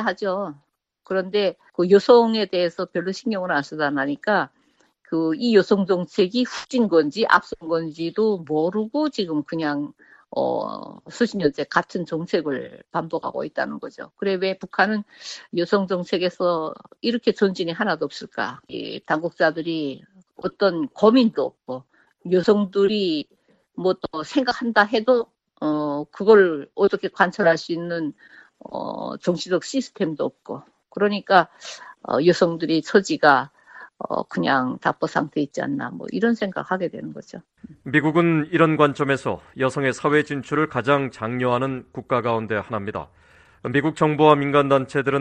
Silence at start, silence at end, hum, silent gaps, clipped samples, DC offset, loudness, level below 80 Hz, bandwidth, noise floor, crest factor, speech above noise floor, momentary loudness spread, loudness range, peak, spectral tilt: 0 s; 0 s; none; none; under 0.1%; under 0.1%; -22 LUFS; -62 dBFS; 9.2 kHz; -62 dBFS; 22 dB; 41 dB; 14 LU; 5 LU; 0 dBFS; -6 dB/octave